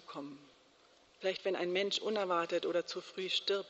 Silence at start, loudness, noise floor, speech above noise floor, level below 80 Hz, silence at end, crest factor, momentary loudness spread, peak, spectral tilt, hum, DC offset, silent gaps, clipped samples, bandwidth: 0.1 s; -35 LUFS; -66 dBFS; 30 dB; -84 dBFS; 0 s; 18 dB; 14 LU; -20 dBFS; -1.5 dB/octave; none; under 0.1%; none; under 0.1%; 8 kHz